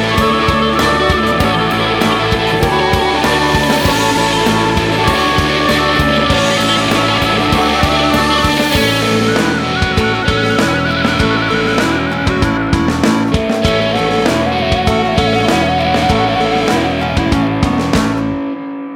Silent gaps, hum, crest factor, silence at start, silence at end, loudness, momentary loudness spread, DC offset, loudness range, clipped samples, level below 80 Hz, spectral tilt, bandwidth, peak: none; none; 12 dB; 0 s; 0 s; -13 LUFS; 3 LU; under 0.1%; 2 LU; under 0.1%; -28 dBFS; -5 dB/octave; 19 kHz; 0 dBFS